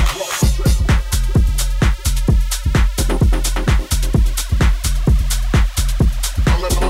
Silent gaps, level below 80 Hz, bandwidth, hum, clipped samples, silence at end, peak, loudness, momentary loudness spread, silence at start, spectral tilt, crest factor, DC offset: none; -16 dBFS; 16 kHz; none; under 0.1%; 0 s; -4 dBFS; -17 LUFS; 2 LU; 0 s; -4.5 dB/octave; 12 dB; under 0.1%